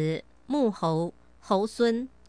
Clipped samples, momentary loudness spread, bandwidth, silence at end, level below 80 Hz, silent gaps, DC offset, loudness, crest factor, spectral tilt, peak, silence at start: under 0.1%; 7 LU; 10.5 kHz; 0.2 s; -62 dBFS; none; 0.1%; -28 LUFS; 16 dB; -6.5 dB/octave; -12 dBFS; 0 s